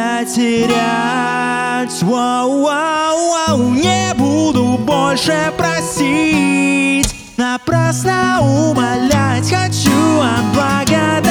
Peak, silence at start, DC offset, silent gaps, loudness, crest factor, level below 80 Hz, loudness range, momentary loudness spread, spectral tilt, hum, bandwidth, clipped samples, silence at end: 0 dBFS; 0 s; under 0.1%; none; -14 LUFS; 14 dB; -38 dBFS; 1 LU; 3 LU; -4.5 dB/octave; none; over 20 kHz; under 0.1%; 0 s